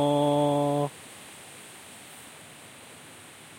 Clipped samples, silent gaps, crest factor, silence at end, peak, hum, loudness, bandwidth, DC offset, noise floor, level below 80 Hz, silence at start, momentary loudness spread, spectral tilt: under 0.1%; none; 18 dB; 0 s; -12 dBFS; none; -26 LUFS; 16.5 kHz; under 0.1%; -48 dBFS; -72 dBFS; 0 s; 22 LU; -6 dB/octave